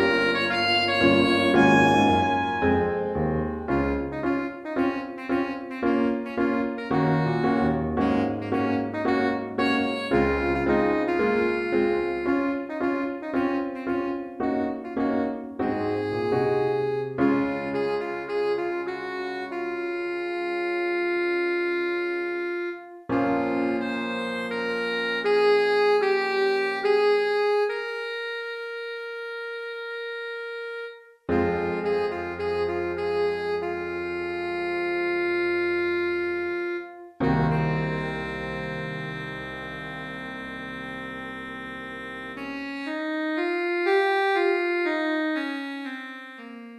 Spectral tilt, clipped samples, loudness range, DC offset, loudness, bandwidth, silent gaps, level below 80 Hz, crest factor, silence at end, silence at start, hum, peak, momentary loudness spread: -6.5 dB/octave; under 0.1%; 8 LU; under 0.1%; -26 LUFS; 11.5 kHz; none; -50 dBFS; 18 dB; 0 s; 0 s; none; -6 dBFS; 12 LU